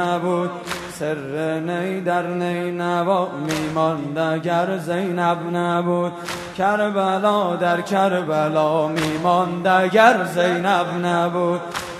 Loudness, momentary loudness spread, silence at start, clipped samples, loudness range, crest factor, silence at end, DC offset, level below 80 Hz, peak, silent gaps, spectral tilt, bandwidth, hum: -20 LUFS; 7 LU; 0 s; under 0.1%; 4 LU; 20 dB; 0 s; under 0.1%; -58 dBFS; 0 dBFS; none; -5.5 dB/octave; 13.5 kHz; none